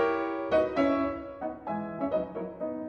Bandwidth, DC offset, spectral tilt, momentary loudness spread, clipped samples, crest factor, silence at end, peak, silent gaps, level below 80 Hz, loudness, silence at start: 6.6 kHz; under 0.1%; -7.5 dB/octave; 10 LU; under 0.1%; 16 dB; 0 s; -14 dBFS; none; -56 dBFS; -30 LUFS; 0 s